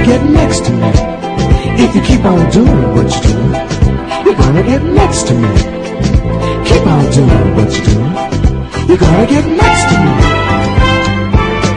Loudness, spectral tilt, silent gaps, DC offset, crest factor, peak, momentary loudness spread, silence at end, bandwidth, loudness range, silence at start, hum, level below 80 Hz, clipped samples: -10 LUFS; -6 dB/octave; none; under 0.1%; 8 dB; 0 dBFS; 5 LU; 0 s; 10.5 kHz; 1 LU; 0 s; none; -18 dBFS; 0.5%